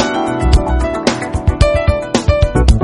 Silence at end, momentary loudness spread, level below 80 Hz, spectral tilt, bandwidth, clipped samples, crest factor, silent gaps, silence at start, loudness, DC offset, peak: 0 s; 4 LU; -16 dBFS; -6 dB/octave; 11 kHz; 0.3%; 12 dB; none; 0 s; -14 LUFS; under 0.1%; 0 dBFS